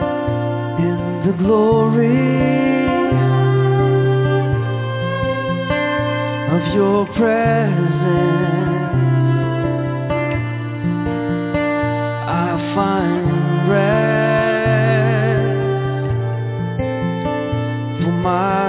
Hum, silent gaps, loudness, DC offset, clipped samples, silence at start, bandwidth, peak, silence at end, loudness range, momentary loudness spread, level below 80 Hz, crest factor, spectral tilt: none; none; -17 LUFS; under 0.1%; under 0.1%; 0 s; 4 kHz; -4 dBFS; 0 s; 4 LU; 6 LU; -40 dBFS; 14 dB; -11.5 dB/octave